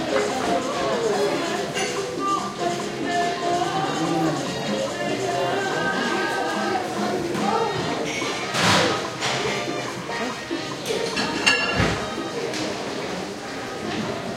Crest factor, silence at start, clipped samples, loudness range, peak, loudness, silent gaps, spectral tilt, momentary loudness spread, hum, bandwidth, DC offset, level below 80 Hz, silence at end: 22 dB; 0 s; under 0.1%; 2 LU; -2 dBFS; -24 LUFS; none; -3.5 dB/octave; 8 LU; none; 16.5 kHz; under 0.1%; -52 dBFS; 0 s